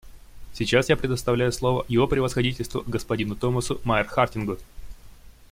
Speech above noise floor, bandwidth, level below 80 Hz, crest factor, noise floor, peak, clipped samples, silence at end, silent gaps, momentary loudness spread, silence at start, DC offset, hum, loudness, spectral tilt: 22 dB; 16.5 kHz; -42 dBFS; 20 dB; -46 dBFS; -6 dBFS; under 0.1%; 0.05 s; none; 9 LU; 0.05 s; under 0.1%; none; -24 LUFS; -5.5 dB/octave